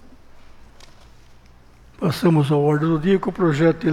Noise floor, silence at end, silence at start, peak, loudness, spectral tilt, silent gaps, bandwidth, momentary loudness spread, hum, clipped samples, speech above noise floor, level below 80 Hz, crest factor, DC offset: -47 dBFS; 0 s; 0.35 s; -6 dBFS; -19 LUFS; -8 dB/octave; none; 15 kHz; 4 LU; none; under 0.1%; 30 dB; -48 dBFS; 16 dB; under 0.1%